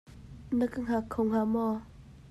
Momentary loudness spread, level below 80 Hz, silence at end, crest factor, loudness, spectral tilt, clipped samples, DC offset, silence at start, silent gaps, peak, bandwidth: 13 LU; -54 dBFS; 0 s; 14 dB; -31 LUFS; -8 dB/octave; under 0.1%; under 0.1%; 0.1 s; none; -18 dBFS; 12.5 kHz